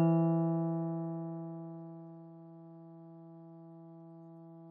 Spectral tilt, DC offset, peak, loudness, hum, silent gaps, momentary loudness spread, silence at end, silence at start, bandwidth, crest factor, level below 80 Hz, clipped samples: -12.5 dB/octave; under 0.1%; -18 dBFS; -35 LUFS; none; none; 22 LU; 0 s; 0 s; 2.9 kHz; 18 dB; under -90 dBFS; under 0.1%